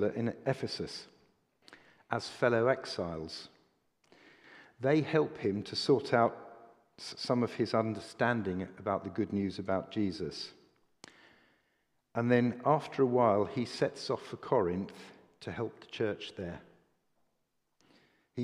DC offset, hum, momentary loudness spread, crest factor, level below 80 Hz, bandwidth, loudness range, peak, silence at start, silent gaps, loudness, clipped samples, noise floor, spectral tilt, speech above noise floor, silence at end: under 0.1%; none; 15 LU; 22 dB; -70 dBFS; 12 kHz; 6 LU; -12 dBFS; 0 s; none; -33 LUFS; under 0.1%; -79 dBFS; -6.5 dB/octave; 47 dB; 0 s